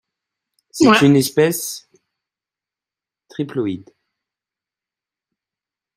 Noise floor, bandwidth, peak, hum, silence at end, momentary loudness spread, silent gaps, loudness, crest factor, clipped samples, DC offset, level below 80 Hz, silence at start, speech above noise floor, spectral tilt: -89 dBFS; 16 kHz; 0 dBFS; none; 2.15 s; 21 LU; none; -16 LUFS; 20 dB; under 0.1%; under 0.1%; -58 dBFS; 0.75 s; 74 dB; -5 dB/octave